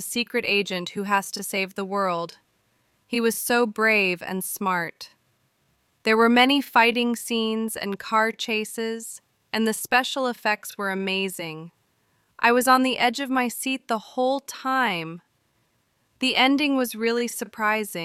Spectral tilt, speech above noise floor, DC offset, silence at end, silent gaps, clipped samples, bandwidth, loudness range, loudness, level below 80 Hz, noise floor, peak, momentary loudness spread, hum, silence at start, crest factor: -3 dB/octave; 45 dB; under 0.1%; 0 s; none; under 0.1%; 16.5 kHz; 4 LU; -23 LUFS; -72 dBFS; -69 dBFS; -6 dBFS; 12 LU; none; 0 s; 20 dB